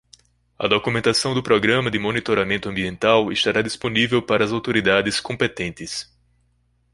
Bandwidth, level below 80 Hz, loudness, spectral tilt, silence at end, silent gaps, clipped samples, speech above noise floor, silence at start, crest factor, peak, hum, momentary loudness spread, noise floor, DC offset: 11.5 kHz; -50 dBFS; -20 LUFS; -4.5 dB/octave; 0.9 s; none; under 0.1%; 44 dB; 0.6 s; 20 dB; -2 dBFS; 60 Hz at -50 dBFS; 9 LU; -64 dBFS; under 0.1%